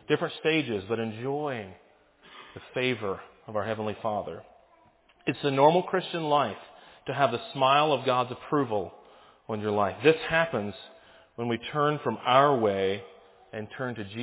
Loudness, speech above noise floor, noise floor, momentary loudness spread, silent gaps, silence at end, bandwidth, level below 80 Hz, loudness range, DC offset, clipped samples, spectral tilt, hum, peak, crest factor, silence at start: -27 LUFS; 34 dB; -61 dBFS; 17 LU; none; 0 s; 4 kHz; -64 dBFS; 7 LU; under 0.1%; under 0.1%; -9.5 dB/octave; none; -8 dBFS; 22 dB; 0.1 s